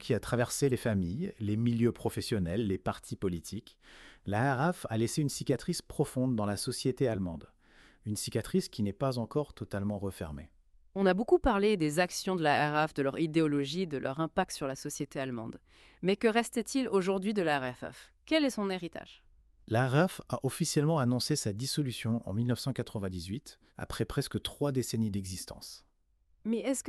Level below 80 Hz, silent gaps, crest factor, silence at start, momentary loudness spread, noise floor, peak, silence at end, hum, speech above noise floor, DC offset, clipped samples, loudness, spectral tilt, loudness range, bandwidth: -56 dBFS; none; 20 dB; 0 s; 13 LU; -70 dBFS; -12 dBFS; 0 s; none; 38 dB; under 0.1%; under 0.1%; -32 LUFS; -5.5 dB/octave; 5 LU; 13.5 kHz